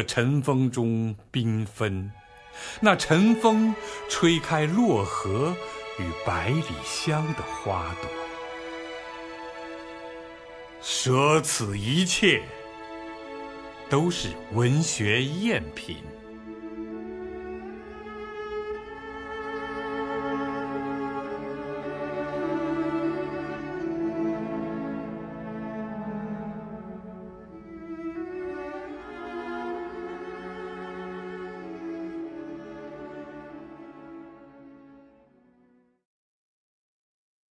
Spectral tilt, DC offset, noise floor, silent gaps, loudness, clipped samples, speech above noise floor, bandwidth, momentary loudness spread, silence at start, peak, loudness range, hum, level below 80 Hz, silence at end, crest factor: -5 dB/octave; under 0.1%; -63 dBFS; none; -28 LUFS; under 0.1%; 38 dB; 11 kHz; 18 LU; 0 s; -4 dBFS; 13 LU; none; -54 dBFS; 2.45 s; 26 dB